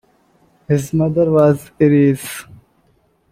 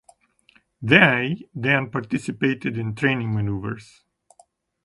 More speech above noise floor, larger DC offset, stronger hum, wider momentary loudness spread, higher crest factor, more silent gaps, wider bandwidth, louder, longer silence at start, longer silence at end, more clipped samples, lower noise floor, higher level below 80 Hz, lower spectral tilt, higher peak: first, 44 dB vs 38 dB; neither; neither; second, 12 LU vs 15 LU; second, 16 dB vs 24 dB; neither; first, 16 kHz vs 11.5 kHz; first, -15 LUFS vs -21 LUFS; about the same, 0.7 s vs 0.8 s; about the same, 0.9 s vs 1 s; neither; about the same, -58 dBFS vs -60 dBFS; about the same, -50 dBFS vs -54 dBFS; about the same, -7.5 dB/octave vs -6.5 dB/octave; about the same, -2 dBFS vs 0 dBFS